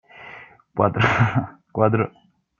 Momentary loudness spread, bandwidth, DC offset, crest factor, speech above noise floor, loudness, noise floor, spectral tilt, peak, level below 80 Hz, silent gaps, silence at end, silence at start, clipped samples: 21 LU; 7.2 kHz; under 0.1%; 20 dB; 24 dB; -21 LUFS; -44 dBFS; -7.5 dB/octave; -2 dBFS; -52 dBFS; none; 0.5 s; 0.15 s; under 0.1%